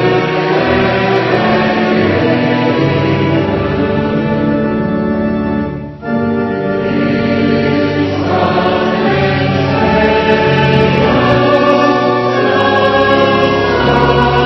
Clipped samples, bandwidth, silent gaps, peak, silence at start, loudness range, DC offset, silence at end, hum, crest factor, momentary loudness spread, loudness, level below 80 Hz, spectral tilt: under 0.1%; 6.2 kHz; none; 0 dBFS; 0 s; 4 LU; under 0.1%; 0 s; none; 12 dB; 5 LU; -12 LUFS; -34 dBFS; -7.5 dB/octave